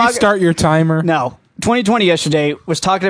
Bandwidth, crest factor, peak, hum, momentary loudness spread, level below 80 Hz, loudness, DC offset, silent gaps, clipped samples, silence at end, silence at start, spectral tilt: 11 kHz; 14 dB; 0 dBFS; none; 5 LU; -44 dBFS; -14 LUFS; under 0.1%; none; under 0.1%; 0 s; 0 s; -5 dB/octave